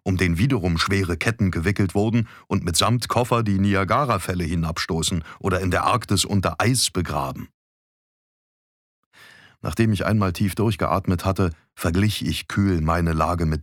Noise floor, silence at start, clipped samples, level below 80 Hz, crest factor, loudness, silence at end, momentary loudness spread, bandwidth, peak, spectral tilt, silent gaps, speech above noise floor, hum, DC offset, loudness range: -50 dBFS; 0.05 s; under 0.1%; -40 dBFS; 18 dB; -22 LUFS; 0 s; 6 LU; 17.5 kHz; -4 dBFS; -5 dB/octave; 7.54-9.11 s; 28 dB; none; under 0.1%; 5 LU